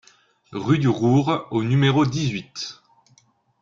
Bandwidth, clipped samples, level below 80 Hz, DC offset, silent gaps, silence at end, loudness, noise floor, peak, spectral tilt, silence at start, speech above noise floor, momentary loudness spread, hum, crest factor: 7.6 kHz; under 0.1%; -56 dBFS; under 0.1%; none; 0.9 s; -21 LUFS; -60 dBFS; -6 dBFS; -6.5 dB/octave; 0.5 s; 40 dB; 14 LU; none; 16 dB